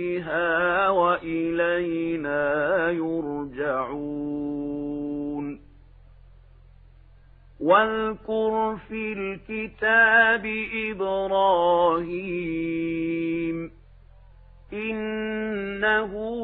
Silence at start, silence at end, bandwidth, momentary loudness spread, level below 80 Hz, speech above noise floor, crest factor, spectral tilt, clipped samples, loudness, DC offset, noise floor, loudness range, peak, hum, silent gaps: 0 s; 0 s; 4.2 kHz; 11 LU; -52 dBFS; 27 dB; 20 dB; -9 dB/octave; under 0.1%; -24 LUFS; under 0.1%; -51 dBFS; 10 LU; -6 dBFS; none; none